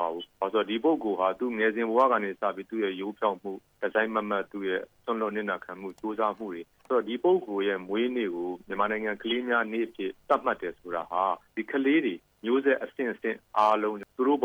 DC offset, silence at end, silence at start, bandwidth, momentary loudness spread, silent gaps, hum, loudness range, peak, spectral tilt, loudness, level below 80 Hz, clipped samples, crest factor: under 0.1%; 0 s; 0 s; over 20 kHz; 10 LU; none; none; 3 LU; -12 dBFS; -6.5 dB/octave; -29 LUFS; -70 dBFS; under 0.1%; 18 dB